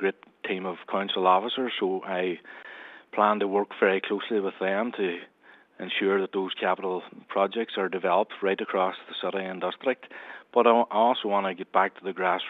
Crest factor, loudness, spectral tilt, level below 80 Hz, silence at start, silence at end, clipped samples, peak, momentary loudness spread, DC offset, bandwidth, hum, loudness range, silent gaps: 22 dB; -27 LUFS; -7 dB/octave; -86 dBFS; 0 s; 0 s; under 0.1%; -6 dBFS; 12 LU; under 0.1%; 4.5 kHz; none; 3 LU; none